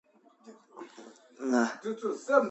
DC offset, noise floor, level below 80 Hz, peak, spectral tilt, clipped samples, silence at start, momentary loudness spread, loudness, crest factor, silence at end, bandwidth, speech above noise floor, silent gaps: under 0.1%; -56 dBFS; -86 dBFS; -8 dBFS; -4.5 dB/octave; under 0.1%; 0.45 s; 23 LU; -30 LUFS; 24 dB; 0 s; 8.2 kHz; 28 dB; none